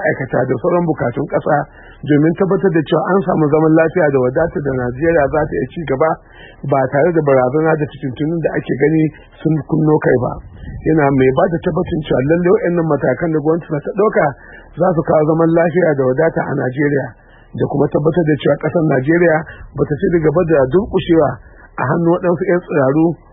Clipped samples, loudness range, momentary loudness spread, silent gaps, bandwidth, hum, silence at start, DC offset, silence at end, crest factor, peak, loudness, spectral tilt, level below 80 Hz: under 0.1%; 2 LU; 8 LU; none; 4 kHz; none; 0 s; under 0.1%; 0.15 s; 14 dB; 0 dBFS; -15 LUFS; -13.5 dB/octave; -40 dBFS